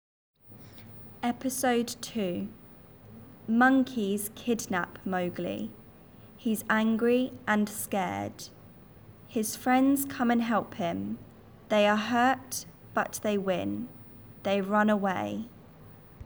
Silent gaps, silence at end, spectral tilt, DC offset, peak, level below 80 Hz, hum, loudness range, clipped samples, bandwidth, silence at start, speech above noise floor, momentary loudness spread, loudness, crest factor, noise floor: none; 0 s; -4.5 dB/octave; under 0.1%; -12 dBFS; -64 dBFS; none; 3 LU; under 0.1%; over 20 kHz; 0.5 s; 24 dB; 17 LU; -29 LUFS; 18 dB; -52 dBFS